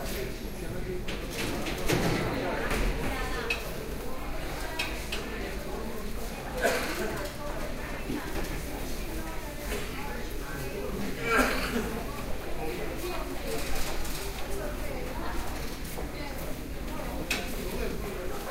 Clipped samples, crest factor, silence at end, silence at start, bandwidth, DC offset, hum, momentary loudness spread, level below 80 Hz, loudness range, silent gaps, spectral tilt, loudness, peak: under 0.1%; 20 dB; 0 s; 0 s; 16 kHz; under 0.1%; none; 9 LU; -38 dBFS; 5 LU; none; -4 dB/octave; -33 LUFS; -10 dBFS